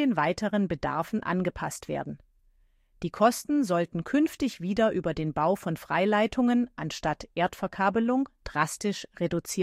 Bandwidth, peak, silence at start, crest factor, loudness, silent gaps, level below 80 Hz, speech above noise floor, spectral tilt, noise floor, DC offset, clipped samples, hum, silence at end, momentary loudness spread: 15.5 kHz; -10 dBFS; 0 s; 18 dB; -28 LUFS; none; -54 dBFS; 37 dB; -5.5 dB/octave; -64 dBFS; under 0.1%; under 0.1%; none; 0 s; 8 LU